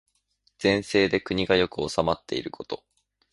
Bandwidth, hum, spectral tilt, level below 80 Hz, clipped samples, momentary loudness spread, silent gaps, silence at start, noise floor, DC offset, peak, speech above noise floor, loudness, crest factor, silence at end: 11.5 kHz; none; -5 dB/octave; -52 dBFS; under 0.1%; 14 LU; none; 0.6 s; -70 dBFS; under 0.1%; -6 dBFS; 45 dB; -25 LUFS; 22 dB; 0.55 s